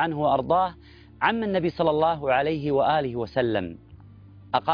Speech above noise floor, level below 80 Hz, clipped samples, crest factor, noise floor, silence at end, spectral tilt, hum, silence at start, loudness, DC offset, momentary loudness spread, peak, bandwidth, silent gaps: 24 dB; -52 dBFS; under 0.1%; 18 dB; -47 dBFS; 0 s; -8.5 dB/octave; none; 0 s; -24 LUFS; under 0.1%; 6 LU; -6 dBFS; 5.2 kHz; none